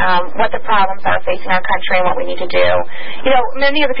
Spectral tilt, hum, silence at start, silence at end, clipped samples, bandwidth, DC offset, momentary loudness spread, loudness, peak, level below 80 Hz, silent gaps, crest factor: -9.5 dB/octave; none; 0 s; 0 s; under 0.1%; 5.6 kHz; 30%; 5 LU; -16 LUFS; 0 dBFS; -38 dBFS; none; 14 dB